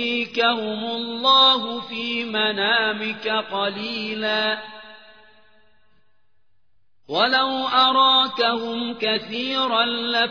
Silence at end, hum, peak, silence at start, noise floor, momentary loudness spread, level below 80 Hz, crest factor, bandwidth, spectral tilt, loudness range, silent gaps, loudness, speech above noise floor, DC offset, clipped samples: 0 s; none; -4 dBFS; 0 s; -73 dBFS; 11 LU; -70 dBFS; 18 dB; 5.4 kHz; -4 dB/octave; 8 LU; none; -20 LUFS; 52 dB; 0.2%; under 0.1%